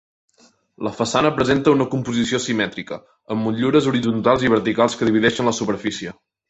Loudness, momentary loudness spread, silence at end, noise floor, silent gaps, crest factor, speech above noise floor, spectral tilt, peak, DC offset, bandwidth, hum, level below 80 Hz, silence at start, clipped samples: -19 LUFS; 12 LU; 0.4 s; -57 dBFS; none; 18 dB; 38 dB; -5 dB/octave; -2 dBFS; under 0.1%; 8.4 kHz; none; -52 dBFS; 0.8 s; under 0.1%